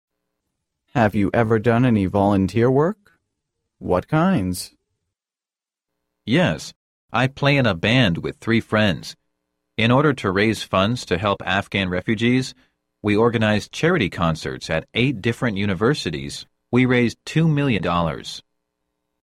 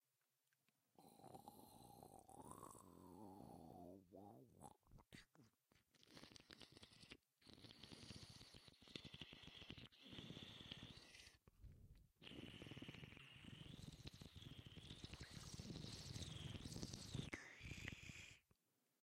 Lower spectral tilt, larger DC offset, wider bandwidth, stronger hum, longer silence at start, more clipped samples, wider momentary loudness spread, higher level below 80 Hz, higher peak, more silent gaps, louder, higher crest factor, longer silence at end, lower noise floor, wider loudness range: first, -6 dB/octave vs -4 dB/octave; neither; about the same, 14.5 kHz vs 15.5 kHz; neither; about the same, 0.95 s vs 1 s; neither; about the same, 12 LU vs 12 LU; first, -48 dBFS vs -72 dBFS; first, -4 dBFS vs -32 dBFS; first, 6.76-7.08 s vs none; first, -20 LUFS vs -59 LUFS; second, 18 dB vs 28 dB; first, 0.85 s vs 0.5 s; about the same, under -90 dBFS vs -90 dBFS; second, 4 LU vs 10 LU